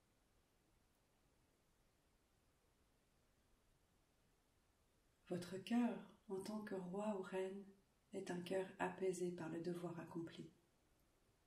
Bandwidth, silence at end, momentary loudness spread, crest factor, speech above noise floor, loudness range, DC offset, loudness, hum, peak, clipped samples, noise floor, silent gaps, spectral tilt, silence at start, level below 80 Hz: 15.5 kHz; 0.95 s; 12 LU; 20 dB; 33 dB; 3 LU; under 0.1%; -47 LUFS; none; -30 dBFS; under 0.1%; -80 dBFS; none; -6 dB/octave; 5.25 s; -84 dBFS